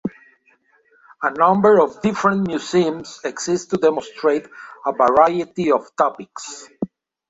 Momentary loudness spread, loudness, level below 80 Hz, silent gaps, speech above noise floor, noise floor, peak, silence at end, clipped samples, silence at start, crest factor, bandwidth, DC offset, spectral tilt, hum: 17 LU; -18 LUFS; -58 dBFS; none; 41 dB; -59 dBFS; -2 dBFS; 0.45 s; under 0.1%; 0.05 s; 18 dB; 8 kHz; under 0.1%; -5.5 dB/octave; none